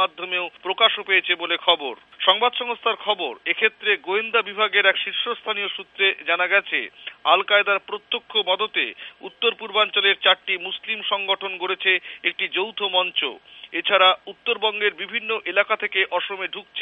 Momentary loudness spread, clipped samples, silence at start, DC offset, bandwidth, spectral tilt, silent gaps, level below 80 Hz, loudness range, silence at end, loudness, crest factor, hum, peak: 10 LU; under 0.1%; 0 s; under 0.1%; 4.7 kHz; -4.5 dB/octave; none; -76 dBFS; 1 LU; 0 s; -21 LUFS; 22 dB; none; 0 dBFS